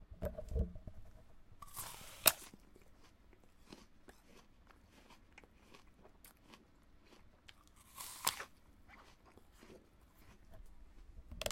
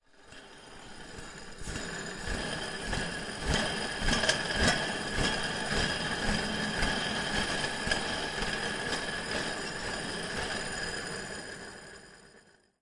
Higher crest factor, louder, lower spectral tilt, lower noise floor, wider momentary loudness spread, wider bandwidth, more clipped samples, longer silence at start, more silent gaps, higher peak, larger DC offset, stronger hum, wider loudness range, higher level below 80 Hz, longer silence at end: first, 40 dB vs 22 dB; second, -39 LUFS vs -32 LUFS; about the same, -2 dB/octave vs -3 dB/octave; first, -65 dBFS vs -61 dBFS; first, 25 LU vs 17 LU; first, 16.5 kHz vs 11.5 kHz; neither; second, 0 s vs 0.15 s; neither; first, -8 dBFS vs -12 dBFS; neither; neither; first, 23 LU vs 7 LU; second, -56 dBFS vs -44 dBFS; second, 0 s vs 0.4 s